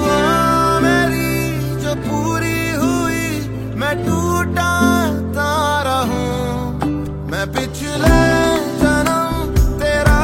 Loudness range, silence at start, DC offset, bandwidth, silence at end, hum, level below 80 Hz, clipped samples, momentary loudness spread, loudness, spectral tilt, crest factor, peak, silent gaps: 2 LU; 0 s; under 0.1%; 16.5 kHz; 0 s; none; -26 dBFS; under 0.1%; 8 LU; -17 LUFS; -5.5 dB/octave; 16 dB; 0 dBFS; none